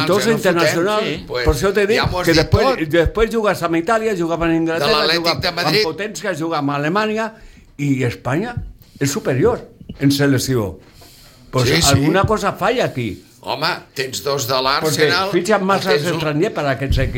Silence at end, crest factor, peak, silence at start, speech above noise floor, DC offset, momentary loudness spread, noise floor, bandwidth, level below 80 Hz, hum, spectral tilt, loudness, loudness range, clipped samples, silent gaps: 0 s; 16 dB; -2 dBFS; 0 s; 26 dB; under 0.1%; 8 LU; -43 dBFS; 17 kHz; -34 dBFS; none; -4.5 dB/octave; -17 LUFS; 4 LU; under 0.1%; none